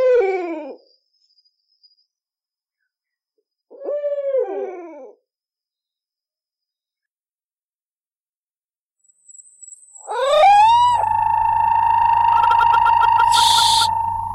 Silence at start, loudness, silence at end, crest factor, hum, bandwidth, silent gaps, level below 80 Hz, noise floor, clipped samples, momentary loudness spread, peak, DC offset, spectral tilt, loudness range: 0 s; -15 LUFS; 0 s; 14 dB; none; 16 kHz; 7.11-7.16 s, 7.43-7.50 s, 7.63-7.97 s, 8.16-8.44 s, 8.50-8.61 s, 8.79-8.90 s; -50 dBFS; under -90 dBFS; under 0.1%; 16 LU; -6 dBFS; under 0.1%; -2 dB/octave; 18 LU